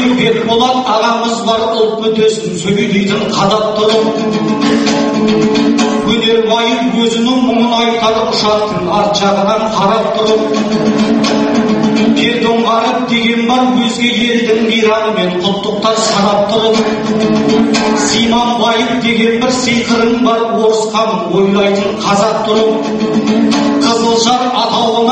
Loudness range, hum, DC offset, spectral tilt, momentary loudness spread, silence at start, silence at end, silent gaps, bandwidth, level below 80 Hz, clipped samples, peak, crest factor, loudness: 1 LU; none; under 0.1%; -4.5 dB/octave; 3 LU; 0 s; 0 s; none; 8.8 kHz; -44 dBFS; under 0.1%; 0 dBFS; 10 dB; -11 LUFS